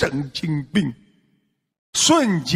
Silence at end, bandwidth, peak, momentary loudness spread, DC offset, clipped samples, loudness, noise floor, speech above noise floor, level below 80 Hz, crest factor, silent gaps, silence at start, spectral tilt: 0 s; 16 kHz; -4 dBFS; 10 LU; under 0.1%; under 0.1%; -20 LUFS; -67 dBFS; 47 dB; -52 dBFS; 18 dB; 1.78-1.93 s; 0 s; -3.5 dB/octave